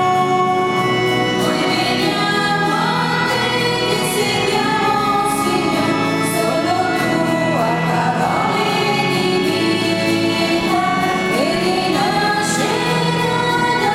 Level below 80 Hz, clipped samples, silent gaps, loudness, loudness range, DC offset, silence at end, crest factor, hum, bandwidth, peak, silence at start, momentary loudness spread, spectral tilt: -48 dBFS; under 0.1%; none; -16 LUFS; 0 LU; under 0.1%; 0 s; 14 dB; none; 16.5 kHz; -2 dBFS; 0 s; 1 LU; -4.5 dB/octave